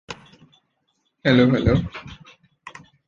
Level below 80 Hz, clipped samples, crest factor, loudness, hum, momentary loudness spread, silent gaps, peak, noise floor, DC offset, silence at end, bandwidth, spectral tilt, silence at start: -40 dBFS; under 0.1%; 20 dB; -19 LUFS; none; 26 LU; none; -4 dBFS; -71 dBFS; under 0.1%; 0.4 s; 7.4 kHz; -7.5 dB/octave; 0.1 s